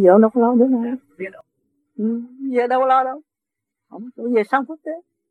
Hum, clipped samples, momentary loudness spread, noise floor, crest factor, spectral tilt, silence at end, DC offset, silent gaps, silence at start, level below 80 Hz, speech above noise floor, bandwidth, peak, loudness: none; under 0.1%; 19 LU; -84 dBFS; 20 dB; -8.5 dB/octave; 0.3 s; under 0.1%; none; 0 s; -82 dBFS; 66 dB; 4.7 kHz; 0 dBFS; -19 LUFS